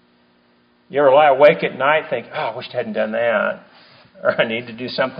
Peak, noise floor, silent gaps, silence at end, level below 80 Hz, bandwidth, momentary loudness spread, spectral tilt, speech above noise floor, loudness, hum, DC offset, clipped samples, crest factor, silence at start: 0 dBFS; -57 dBFS; none; 0 s; -66 dBFS; 5.2 kHz; 13 LU; -2.5 dB/octave; 40 dB; -17 LUFS; none; under 0.1%; under 0.1%; 18 dB; 0.9 s